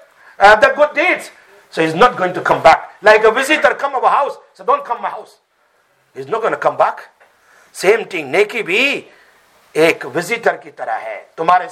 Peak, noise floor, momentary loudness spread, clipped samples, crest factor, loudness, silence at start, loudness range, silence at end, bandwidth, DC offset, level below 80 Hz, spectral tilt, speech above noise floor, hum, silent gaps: 0 dBFS; -58 dBFS; 14 LU; under 0.1%; 16 dB; -14 LUFS; 0.4 s; 7 LU; 0 s; 15.5 kHz; under 0.1%; -50 dBFS; -3.5 dB/octave; 44 dB; none; none